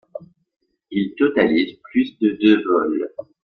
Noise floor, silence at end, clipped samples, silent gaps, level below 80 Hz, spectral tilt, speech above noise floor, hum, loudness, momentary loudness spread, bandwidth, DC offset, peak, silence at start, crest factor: -39 dBFS; 0.35 s; under 0.1%; 0.56-0.60 s; -60 dBFS; -8 dB/octave; 20 dB; none; -19 LUFS; 17 LU; 5 kHz; under 0.1%; -2 dBFS; 0.15 s; 18 dB